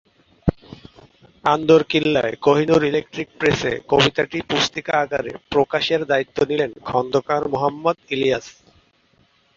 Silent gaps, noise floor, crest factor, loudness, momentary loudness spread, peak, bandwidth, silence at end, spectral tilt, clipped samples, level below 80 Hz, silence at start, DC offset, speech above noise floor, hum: none; -60 dBFS; 20 dB; -20 LUFS; 9 LU; -2 dBFS; 7.6 kHz; 1.05 s; -5 dB/octave; under 0.1%; -44 dBFS; 0.45 s; under 0.1%; 40 dB; none